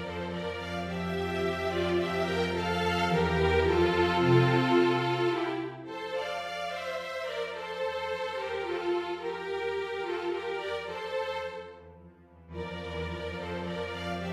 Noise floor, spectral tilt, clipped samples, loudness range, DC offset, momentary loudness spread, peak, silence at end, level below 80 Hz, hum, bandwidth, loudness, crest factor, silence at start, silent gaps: -54 dBFS; -6.5 dB/octave; under 0.1%; 10 LU; under 0.1%; 11 LU; -12 dBFS; 0 s; -50 dBFS; none; 14 kHz; -30 LUFS; 20 dB; 0 s; none